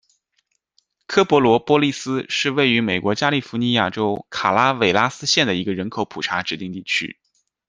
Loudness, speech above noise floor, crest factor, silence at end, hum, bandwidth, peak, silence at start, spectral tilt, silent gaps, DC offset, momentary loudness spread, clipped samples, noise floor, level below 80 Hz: -19 LUFS; 50 dB; 20 dB; 0.55 s; none; 10 kHz; 0 dBFS; 1.1 s; -4.5 dB/octave; none; under 0.1%; 9 LU; under 0.1%; -70 dBFS; -60 dBFS